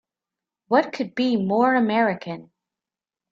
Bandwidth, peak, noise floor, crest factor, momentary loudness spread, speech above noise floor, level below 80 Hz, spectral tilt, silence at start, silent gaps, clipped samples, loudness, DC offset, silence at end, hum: 7.2 kHz; -6 dBFS; -90 dBFS; 18 dB; 13 LU; 69 dB; -68 dBFS; -7 dB/octave; 0.7 s; none; under 0.1%; -21 LUFS; under 0.1%; 0.9 s; none